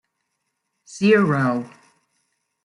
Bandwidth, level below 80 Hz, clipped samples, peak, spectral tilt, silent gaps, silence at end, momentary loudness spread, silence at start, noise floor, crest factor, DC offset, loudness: 11 kHz; -68 dBFS; under 0.1%; -4 dBFS; -7 dB/octave; none; 0.95 s; 23 LU; 0.9 s; -76 dBFS; 20 dB; under 0.1%; -19 LUFS